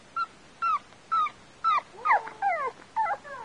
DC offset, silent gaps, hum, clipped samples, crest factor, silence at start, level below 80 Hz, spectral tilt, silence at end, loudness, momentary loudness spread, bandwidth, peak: under 0.1%; none; none; under 0.1%; 18 dB; 0.15 s; -68 dBFS; -2.5 dB/octave; 0 s; -29 LUFS; 7 LU; 10.5 kHz; -12 dBFS